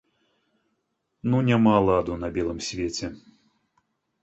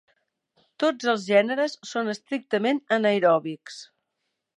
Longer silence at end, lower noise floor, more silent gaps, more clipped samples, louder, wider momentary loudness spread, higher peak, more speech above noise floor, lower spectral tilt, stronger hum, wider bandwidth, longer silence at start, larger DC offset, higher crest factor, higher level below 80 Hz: first, 1.05 s vs 0.75 s; second, -76 dBFS vs -80 dBFS; neither; neither; about the same, -24 LUFS vs -24 LUFS; about the same, 13 LU vs 14 LU; about the same, -8 dBFS vs -6 dBFS; about the same, 53 dB vs 56 dB; first, -6.5 dB/octave vs -4.5 dB/octave; neither; second, 8.2 kHz vs 10.5 kHz; first, 1.25 s vs 0.8 s; neither; about the same, 18 dB vs 20 dB; first, -48 dBFS vs -80 dBFS